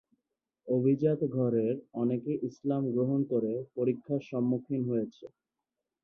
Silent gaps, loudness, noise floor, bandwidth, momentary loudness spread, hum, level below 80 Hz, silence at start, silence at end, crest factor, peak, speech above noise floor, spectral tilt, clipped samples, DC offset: none; -31 LUFS; -88 dBFS; 6.6 kHz; 6 LU; none; -74 dBFS; 0.65 s; 0.75 s; 16 dB; -16 dBFS; 58 dB; -10.5 dB/octave; under 0.1%; under 0.1%